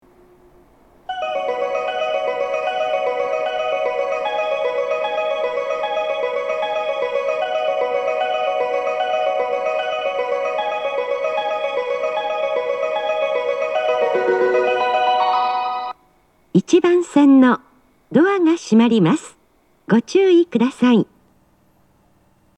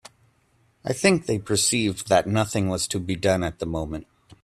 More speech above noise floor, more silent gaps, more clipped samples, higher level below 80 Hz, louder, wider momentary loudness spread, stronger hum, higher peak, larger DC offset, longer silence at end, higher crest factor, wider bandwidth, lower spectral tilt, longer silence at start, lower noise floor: first, 45 dB vs 40 dB; neither; neither; second, -64 dBFS vs -50 dBFS; first, -19 LUFS vs -23 LUFS; second, 7 LU vs 10 LU; neither; about the same, -2 dBFS vs -4 dBFS; neither; first, 1.55 s vs 0.1 s; about the same, 16 dB vs 20 dB; second, 10.5 kHz vs 14 kHz; first, -6 dB/octave vs -4 dB/octave; first, 1.1 s vs 0.85 s; second, -59 dBFS vs -64 dBFS